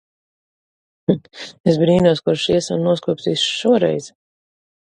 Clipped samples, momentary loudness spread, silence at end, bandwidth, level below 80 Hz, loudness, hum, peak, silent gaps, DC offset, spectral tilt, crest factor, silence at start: under 0.1%; 8 LU; 0.8 s; 11 kHz; -52 dBFS; -18 LUFS; none; 0 dBFS; 1.60-1.64 s; under 0.1%; -5.5 dB/octave; 18 dB; 1.1 s